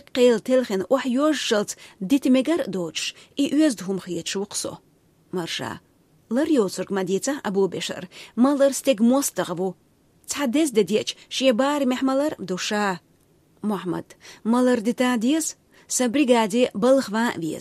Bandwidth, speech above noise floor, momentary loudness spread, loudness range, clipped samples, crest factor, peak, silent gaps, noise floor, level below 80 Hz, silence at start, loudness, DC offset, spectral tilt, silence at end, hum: 15.5 kHz; 37 dB; 11 LU; 5 LU; under 0.1%; 18 dB; -6 dBFS; none; -59 dBFS; -68 dBFS; 0.15 s; -23 LUFS; under 0.1%; -4 dB/octave; 0 s; none